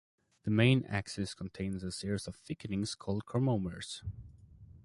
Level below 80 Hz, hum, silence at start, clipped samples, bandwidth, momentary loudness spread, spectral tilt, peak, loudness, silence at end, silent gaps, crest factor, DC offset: -56 dBFS; none; 0.45 s; under 0.1%; 11.5 kHz; 15 LU; -6 dB/octave; -12 dBFS; -35 LUFS; 0.05 s; none; 22 dB; under 0.1%